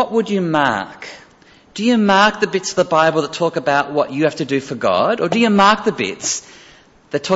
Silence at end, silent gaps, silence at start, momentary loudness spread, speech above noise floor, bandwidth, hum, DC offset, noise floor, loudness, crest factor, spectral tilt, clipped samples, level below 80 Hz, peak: 0 s; none; 0 s; 12 LU; 32 dB; 8 kHz; none; under 0.1%; -48 dBFS; -16 LUFS; 16 dB; -4 dB/octave; under 0.1%; -56 dBFS; -2 dBFS